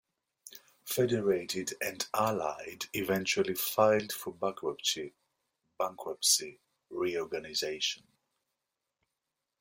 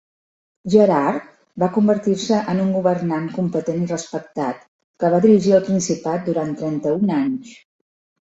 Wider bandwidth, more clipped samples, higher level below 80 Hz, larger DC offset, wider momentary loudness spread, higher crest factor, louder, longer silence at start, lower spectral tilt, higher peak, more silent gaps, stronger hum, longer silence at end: first, 16.5 kHz vs 8 kHz; neither; second, -72 dBFS vs -60 dBFS; neither; first, 17 LU vs 12 LU; about the same, 22 dB vs 18 dB; second, -32 LUFS vs -19 LUFS; second, 0.45 s vs 0.65 s; second, -2.5 dB/octave vs -6.5 dB/octave; second, -12 dBFS vs -2 dBFS; second, none vs 4.68-4.94 s; neither; first, 1.65 s vs 0.75 s